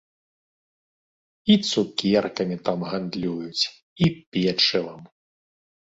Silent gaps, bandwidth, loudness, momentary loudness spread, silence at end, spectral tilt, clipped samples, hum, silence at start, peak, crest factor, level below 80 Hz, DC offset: 3.82-3.96 s, 4.27-4.32 s; 8 kHz; -23 LUFS; 9 LU; 0.9 s; -5 dB/octave; under 0.1%; none; 1.45 s; -6 dBFS; 20 dB; -58 dBFS; under 0.1%